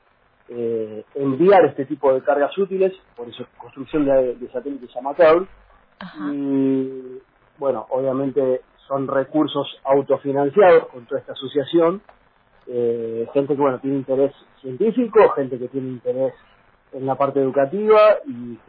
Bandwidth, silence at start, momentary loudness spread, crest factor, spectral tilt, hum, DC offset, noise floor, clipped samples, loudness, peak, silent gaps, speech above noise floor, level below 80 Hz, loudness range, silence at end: 5.2 kHz; 0.5 s; 17 LU; 16 dB; -10 dB/octave; none; under 0.1%; -57 dBFS; under 0.1%; -20 LUFS; -2 dBFS; none; 37 dB; -56 dBFS; 4 LU; 0.1 s